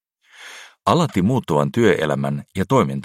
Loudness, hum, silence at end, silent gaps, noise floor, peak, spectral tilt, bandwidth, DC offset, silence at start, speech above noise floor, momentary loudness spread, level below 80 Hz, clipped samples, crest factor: -19 LUFS; none; 0 s; none; -44 dBFS; -2 dBFS; -6.5 dB/octave; 15.5 kHz; under 0.1%; 0.4 s; 26 dB; 16 LU; -52 dBFS; under 0.1%; 18 dB